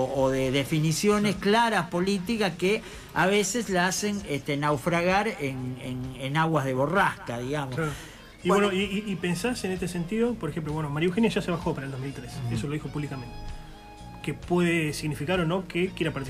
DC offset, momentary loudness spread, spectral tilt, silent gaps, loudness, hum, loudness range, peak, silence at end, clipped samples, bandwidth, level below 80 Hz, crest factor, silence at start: under 0.1%; 12 LU; -5 dB/octave; none; -27 LUFS; none; 5 LU; -12 dBFS; 0 s; under 0.1%; 15.5 kHz; -48 dBFS; 14 dB; 0 s